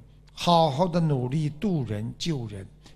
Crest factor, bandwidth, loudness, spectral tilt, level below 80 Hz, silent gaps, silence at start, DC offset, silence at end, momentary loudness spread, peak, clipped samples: 20 dB; 13 kHz; -26 LUFS; -6.5 dB/octave; -50 dBFS; none; 0.35 s; under 0.1%; 0.05 s; 11 LU; -6 dBFS; under 0.1%